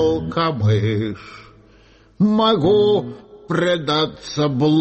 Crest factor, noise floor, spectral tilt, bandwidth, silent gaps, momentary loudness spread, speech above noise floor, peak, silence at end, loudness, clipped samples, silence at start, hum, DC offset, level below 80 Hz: 12 dB; -50 dBFS; -7 dB/octave; 8.4 kHz; none; 10 LU; 32 dB; -6 dBFS; 0 s; -18 LUFS; under 0.1%; 0 s; none; under 0.1%; -48 dBFS